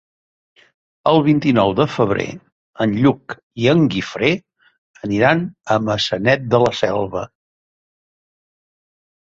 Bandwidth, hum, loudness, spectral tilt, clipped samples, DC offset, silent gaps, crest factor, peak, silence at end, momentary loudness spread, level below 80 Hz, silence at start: 7.8 kHz; none; -17 LUFS; -6.5 dB/octave; under 0.1%; under 0.1%; 2.52-2.73 s, 3.43-3.50 s, 4.78-4.94 s; 18 dB; -2 dBFS; 1.95 s; 11 LU; -50 dBFS; 1.05 s